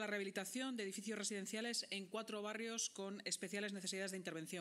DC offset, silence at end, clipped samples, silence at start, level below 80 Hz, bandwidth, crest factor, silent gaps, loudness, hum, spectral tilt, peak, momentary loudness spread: under 0.1%; 0 s; under 0.1%; 0 s; under -90 dBFS; 16 kHz; 18 dB; none; -44 LUFS; none; -2.5 dB/octave; -28 dBFS; 4 LU